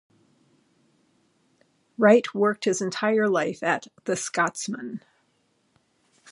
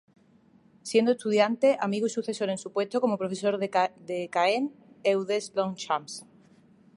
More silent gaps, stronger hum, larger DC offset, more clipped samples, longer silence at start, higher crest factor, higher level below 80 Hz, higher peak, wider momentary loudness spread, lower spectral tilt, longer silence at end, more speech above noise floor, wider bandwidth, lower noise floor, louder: neither; neither; neither; neither; first, 2 s vs 0.85 s; about the same, 22 dB vs 20 dB; about the same, -78 dBFS vs -78 dBFS; first, -4 dBFS vs -8 dBFS; first, 16 LU vs 7 LU; about the same, -4.5 dB/octave vs -4.5 dB/octave; first, 1.35 s vs 0.75 s; first, 45 dB vs 33 dB; about the same, 11.5 kHz vs 11.5 kHz; first, -69 dBFS vs -60 dBFS; first, -24 LUFS vs -27 LUFS